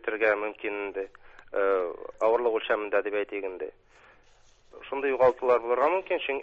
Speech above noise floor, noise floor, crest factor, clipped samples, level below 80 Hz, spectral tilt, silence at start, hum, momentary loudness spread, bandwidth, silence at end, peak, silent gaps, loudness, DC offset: 31 dB; -58 dBFS; 18 dB; under 0.1%; -64 dBFS; -5.5 dB/octave; 0.05 s; none; 13 LU; 7.6 kHz; 0 s; -10 dBFS; none; -27 LUFS; under 0.1%